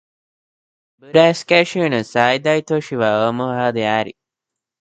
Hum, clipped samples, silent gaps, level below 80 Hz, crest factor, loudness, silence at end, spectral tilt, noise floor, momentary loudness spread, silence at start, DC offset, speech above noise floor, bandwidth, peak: none; under 0.1%; none; -62 dBFS; 18 dB; -17 LUFS; 0.7 s; -5.5 dB/octave; -84 dBFS; 6 LU; 1.1 s; under 0.1%; 67 dB; 9.2 kHz; 0 dBFS